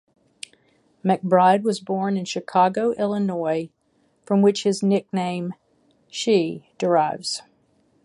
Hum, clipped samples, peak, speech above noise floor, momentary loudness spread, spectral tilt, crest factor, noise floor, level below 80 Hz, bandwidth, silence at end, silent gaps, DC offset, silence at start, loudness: none; under 0.1%; -4 dBFS; 44 dB; 15 LU; -5.5 dB/octave; 20 dB; -65 dBFS; -70 dBFS; 11.5 kHz; 0.65 s; none; under 0.1%; 1.05 s; -22 LUFS